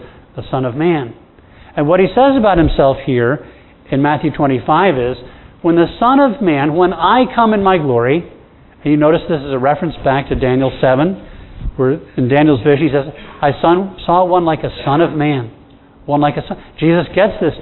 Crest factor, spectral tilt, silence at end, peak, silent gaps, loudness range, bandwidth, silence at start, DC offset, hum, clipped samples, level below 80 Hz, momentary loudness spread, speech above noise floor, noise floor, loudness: 14 dB; -11 dB/octave; 0 s; 0 dBFS; none; 2 LU; 4.2 kHz; 0 s; under 0.1%; none; under 0.1%; -34 dBFS; 10 LU; 29 dB; -42 dBFS; -14 LUFS